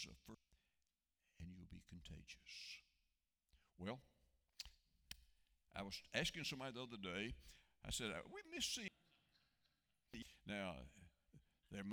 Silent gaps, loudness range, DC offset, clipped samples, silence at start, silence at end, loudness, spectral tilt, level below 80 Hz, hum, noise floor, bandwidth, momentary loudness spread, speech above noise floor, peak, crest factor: none; 11 LU; under 0.1%; under 0.1%; 0 s; 0 s; -50 LUFS; -3 dB/octave; -68 dBFS; none; under -90 dBFS; over 20 kHz; 17 LU; over 41 dB; -26 dBFS; 28 dB